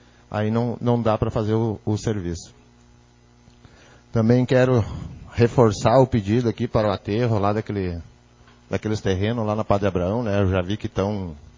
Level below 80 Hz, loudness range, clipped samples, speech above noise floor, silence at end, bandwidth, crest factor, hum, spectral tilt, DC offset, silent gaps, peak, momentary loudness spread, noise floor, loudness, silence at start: -40 dBFS; 6 LU; under 0.1%; 32 dB; 0.2 s; 7.6 kHz; 20 dB; 60 Hz at -45 dBFS; -7.5 dB/octave; under 0.1%; none; -2 dBFS; 12 LU; -53 dBFS; -22 LUFS; 0.3 s